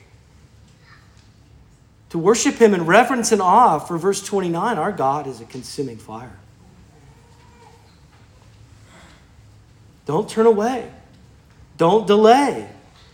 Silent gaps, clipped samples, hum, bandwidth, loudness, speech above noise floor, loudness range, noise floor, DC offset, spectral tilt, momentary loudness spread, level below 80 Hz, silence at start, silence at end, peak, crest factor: none; under 0.1%; none; 17 kHz; -17 LUFS; 33 dB; 16 LU; -50 dBFS; under 0.1%; -4.5 dB/octave; 19 LU; -56 dBFS; 2.15 s; 0.45 s; 0 dBFS; 20 dB